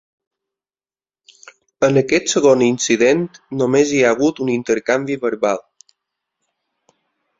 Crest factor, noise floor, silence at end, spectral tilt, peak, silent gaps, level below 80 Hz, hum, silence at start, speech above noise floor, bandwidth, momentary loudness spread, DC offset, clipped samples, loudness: 18 dB; under -90 dBFS; 1.8 s; -4.5 dB/octave; 0 dBFS; none; -58 dBFS; none; 1.8 s; over 74 dB; 7.8 kHz; 7 LU; under 0.1%; under 0.1%; -16 LUFS